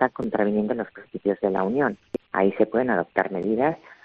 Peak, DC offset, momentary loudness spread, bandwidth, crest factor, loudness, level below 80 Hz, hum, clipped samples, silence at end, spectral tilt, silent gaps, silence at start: -4 dBFS; under 0.1%; 7 LU; 5.2 kHz; 20 dB; -24 LUFS; -62 dBFS; none; under 0.1%; 0.1 s; -6 dB/octave; none; 0 s